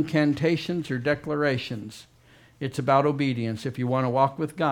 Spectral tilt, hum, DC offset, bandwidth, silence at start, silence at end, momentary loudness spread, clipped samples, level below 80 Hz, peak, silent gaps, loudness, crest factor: -7 dB/octave; none; under 0.1%; 16 kHz; 0 s; 0 s; 13 LU; under 0.1%; -60 dBFS; -6 dBFS; none; -25 LUFS; 20 dB